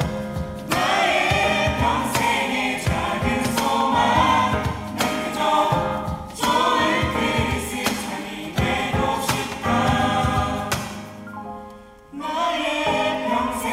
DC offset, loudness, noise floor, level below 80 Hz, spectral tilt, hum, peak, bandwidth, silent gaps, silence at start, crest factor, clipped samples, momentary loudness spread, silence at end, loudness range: under 0.1%; -21 LUFS; -42 dBFS; -40 dBFS; -4.5 dB/octave; none; -4 dBFS; 16 kHz; none; 0 s; 16 dB; under 0.1%; 12 LU; 0 s; 4 LU